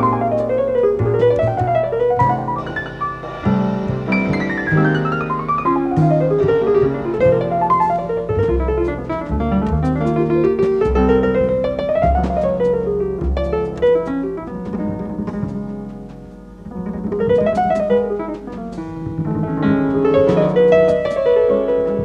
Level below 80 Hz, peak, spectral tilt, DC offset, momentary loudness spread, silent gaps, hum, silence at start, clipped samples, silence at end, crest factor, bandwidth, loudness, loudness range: -32 dBFS; -2 dBFS; -9 dB/octave; under 0.1%; 10 LU; none; none; 0 s; under 0.1%; 0 s; 14 dB; 8.2 kHz; -17 LUFS; 5 LU